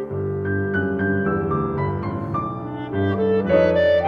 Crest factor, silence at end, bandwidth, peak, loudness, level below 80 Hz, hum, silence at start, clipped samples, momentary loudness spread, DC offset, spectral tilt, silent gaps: 16 dB; 0 s; 6.4 kHz; -4 dBFS; -22 LUFS; -46 dBFS; none; 0 s; under 0.1%; 9 LU; under 0.1%; -9.5 dB/octave; none